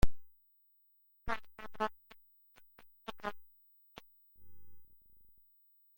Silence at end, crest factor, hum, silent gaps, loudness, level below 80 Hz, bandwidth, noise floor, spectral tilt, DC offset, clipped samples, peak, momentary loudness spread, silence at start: 0 s; 24 dB; 50 Hz at -80 dBFS; none; -44 LUFS; -48 dBFS; 16.5 kHz; -70 dBFS; -5.5 dB/octave; under 0.1%; under 0.1%; -14 dBFS; 26 LU; 0 s